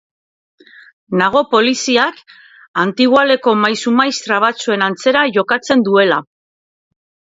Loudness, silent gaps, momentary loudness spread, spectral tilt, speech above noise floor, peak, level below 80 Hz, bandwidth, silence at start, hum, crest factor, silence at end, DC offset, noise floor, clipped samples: -14 LUFS; 2.68-2.74 s; 6 LU; -4 dB/octave; over 76 dB; 0 dBFS; -60 dBFS; 7.8 kHz; 1.1 s; none; 16 dB; 1.05 s; under 0.1%; under -90 dBFS; under 0.1%